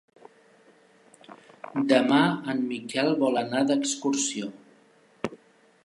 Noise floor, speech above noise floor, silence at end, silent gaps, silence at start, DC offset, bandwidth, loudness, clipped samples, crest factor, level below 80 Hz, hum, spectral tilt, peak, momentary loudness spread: -59 dBFS; 35 dB; 0.5 s; none; 1.3 s; under 0.1%; 11.5 kHz; -26 LUFS; under 0.1%; 20 dB; -74 dBFS; none; -4 dB/octave; -8 dBFS; 15 LU